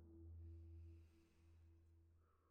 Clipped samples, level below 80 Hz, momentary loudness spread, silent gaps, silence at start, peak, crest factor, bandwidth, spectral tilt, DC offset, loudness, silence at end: under 0.1%; -68 dBFS; 5 LU; none; 0 s; -52 dBFS; 12 dB; 6.6 kHz; -8.5 dB/octave; under 0.1%; -62 LUFS; 0 s